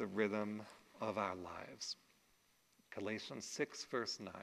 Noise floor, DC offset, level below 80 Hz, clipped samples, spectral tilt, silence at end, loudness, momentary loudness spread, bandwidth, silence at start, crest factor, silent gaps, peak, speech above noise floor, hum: -75 dBFS; under 0.1%; -82 dBFS; under 0.1%; -3.5 dB/octave; 0 s; -44 LUFS; 12 LU; 13 kHz; 0 s; 22 dB; none; -22 dBFS; 31 dB; none